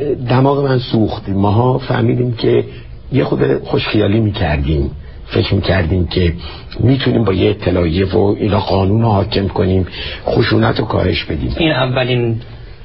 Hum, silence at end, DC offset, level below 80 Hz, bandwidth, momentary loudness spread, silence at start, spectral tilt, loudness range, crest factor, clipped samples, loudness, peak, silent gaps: none; 0 s; 1%; -30 dBFS; 5.8 kHz; 7 LU; 0 s; -11 dB/octave; 2 LU; 14 dB; under 0.1%; -15 LUFS; 0 dBFS; none